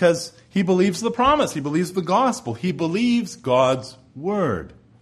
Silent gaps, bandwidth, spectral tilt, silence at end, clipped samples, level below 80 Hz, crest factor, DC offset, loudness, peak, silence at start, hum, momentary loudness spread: none; 14 kHz; -5.5 dB/octave; 0.35 s; under 0.1%; -52 dBFS; 16 dB; under 0.1%; -21 LUFS; -4 dBFS; 0 s; none; 8 LU